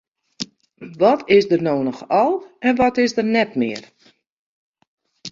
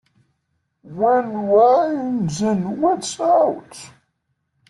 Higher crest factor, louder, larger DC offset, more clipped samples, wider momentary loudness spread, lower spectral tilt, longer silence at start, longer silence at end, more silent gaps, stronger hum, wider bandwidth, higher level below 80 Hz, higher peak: about the same, 18 dB vs 16 dB; about the same, -18 LUFS vs -18 LUFS; neither; neither; about the same, 16 LU vs 17 LU; about the same, -5.5 dB/octave vs -6 dB/octave; second, 0.4 s vs 0.85 s; second, 0 s vs 0.85 s; first, 4.32-4.74 s, 4.87-4.98 s vs none; neither; second, 7.6 kHz vs 12 kHz; about the same, -56 dBFS vs -60 dBFS; about the same, -2 dBFS vs -4 dBFS